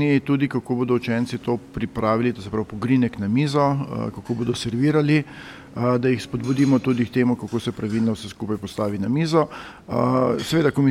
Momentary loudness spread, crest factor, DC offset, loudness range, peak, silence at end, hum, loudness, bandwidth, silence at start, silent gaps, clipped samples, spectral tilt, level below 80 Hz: 9 LU; 16 dB; under 0.1%; 2 LU; -6 dBFS; 0 s; none; -22 LUFS; 14.5 kHz; 0 s; none; under 0.1%; -7 dB/octave; -52 dBFS